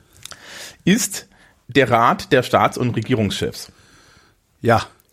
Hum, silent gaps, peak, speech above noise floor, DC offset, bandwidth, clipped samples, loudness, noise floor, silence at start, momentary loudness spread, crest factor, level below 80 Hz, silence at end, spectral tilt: none; none; -2 dBFS; 37 dB; under 0.1%; 16.5 kHz; under 0.1%; -18 LUFS; -55 dBFS; 0.3 s; 20 LU; 18 dB; -50 dBFS; 0.25 s; -4.5 dB/octave